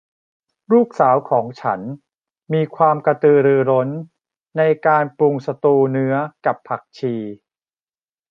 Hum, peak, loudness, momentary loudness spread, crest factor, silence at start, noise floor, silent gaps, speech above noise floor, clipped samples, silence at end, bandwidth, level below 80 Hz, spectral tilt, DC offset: none; -2 dBFS; -18 LUFS; 13 LU; 16 dB; 0.7 s; under -90 dBFS; none; over 73 dB; under 0.1%; 0.95 s; 6.4 kHz; -70 dBFS; -9.5 dB/octave; under 0.1%